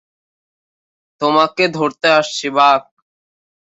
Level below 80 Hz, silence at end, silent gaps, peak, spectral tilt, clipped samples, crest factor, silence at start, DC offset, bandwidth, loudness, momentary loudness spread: -64 dBFS; 0.8 s; none; 0 dBFS; -3.5 dB/octave; under 0.1%; 18 dB; 1.2 s; under 0.1%; 8.2 kHz; -15 LUFS; 6 LU